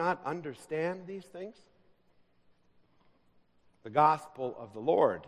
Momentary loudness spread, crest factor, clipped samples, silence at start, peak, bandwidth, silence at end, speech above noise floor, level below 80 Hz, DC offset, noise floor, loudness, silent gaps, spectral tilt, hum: 19 LU; 24 dB; under 0.1%; 0 s; -10 dBFS; 12.5 kHz; 0 s; 35 dB; -76 dBFS; under 0.1%; -67 dBFS; -32 LUFS; none; -6.5 dB/octave; none